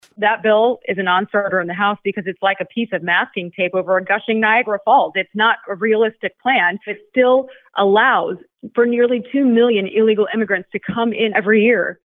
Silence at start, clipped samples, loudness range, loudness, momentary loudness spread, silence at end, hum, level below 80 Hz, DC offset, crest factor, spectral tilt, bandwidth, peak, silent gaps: 0.2 s; under 0.1%; 2 LU; -17 LUFS; 8 LU; 0.1 s; none; -66 dBFS; under 0.1%; 16 dB; -8 dB/octave; 4 kHz; 0 dBFS; none